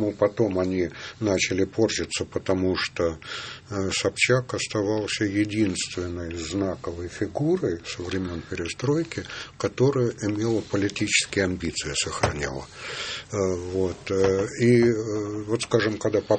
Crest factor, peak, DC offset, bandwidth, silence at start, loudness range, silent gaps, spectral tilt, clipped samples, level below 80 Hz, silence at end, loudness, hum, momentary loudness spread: 20 dB; -6 dBFS; under 0.1%; 8.8 kHz; 0 s; 3 LU; none; -4.5 dB/octave; under 0.1%; -52 dBFS; 0 s; -25 LUFS; none; 10 LU